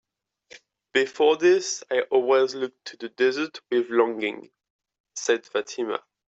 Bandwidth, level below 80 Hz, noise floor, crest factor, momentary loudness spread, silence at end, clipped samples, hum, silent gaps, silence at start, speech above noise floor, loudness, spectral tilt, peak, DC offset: 8 kHz; -76 dBFS; -56 dBFS; 18 dB; 13 LU; 0.4 s; under 0.1%; none; 4.70-4.79 s, 5.00-5.04 s; 0.95 s; 32 dB; -24 LUFS; -2.5 dB/octave; -6 dBFS; under 0.1%